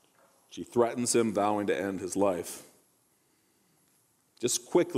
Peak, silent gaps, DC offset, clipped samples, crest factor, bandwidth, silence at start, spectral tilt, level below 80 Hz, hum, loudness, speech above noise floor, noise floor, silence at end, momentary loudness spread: -12 dBFS; none; under 0.1%; under 0.1%; 20 dB; 16 kHz; 0.5 s; -4 dB/octave; -72 dBFS; none; -29 LUFS; 41 dB; -70 dBFS; 0 s; 15 LU